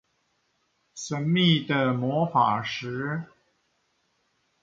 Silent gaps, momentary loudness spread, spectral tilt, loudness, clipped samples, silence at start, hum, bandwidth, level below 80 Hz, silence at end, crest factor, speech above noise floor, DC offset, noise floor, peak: none; 15 LU; -5.5 dB/octave; -25 LUFS; under 0.1%; 0.95 s; none; 7.8 kHz; -68 dBFS; 1.35 s; 20 dB; 47 dB; under 0.1%; -72 dBFS; -8 dBFS